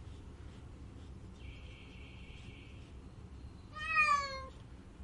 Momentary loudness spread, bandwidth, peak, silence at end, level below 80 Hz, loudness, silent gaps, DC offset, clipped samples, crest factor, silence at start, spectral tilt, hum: 23 LU; 11 kHz; -18 dBFS; 0 s; -54 dBFS; -32 LUFS; none; under 0.1%; under 0.1%; 22 dB; 0 s; -3.5 dB/octave; none